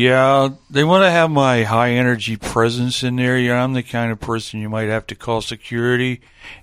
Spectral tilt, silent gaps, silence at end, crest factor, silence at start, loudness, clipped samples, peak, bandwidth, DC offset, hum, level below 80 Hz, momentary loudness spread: -5.5 dB/octave; none; 0.05 s; 16 dB; 0 s; -17 LUFS; under 0.1%; 0 dBFS; 14.5 kHz; under 0.1%; none; -46 dBFS; 11 LU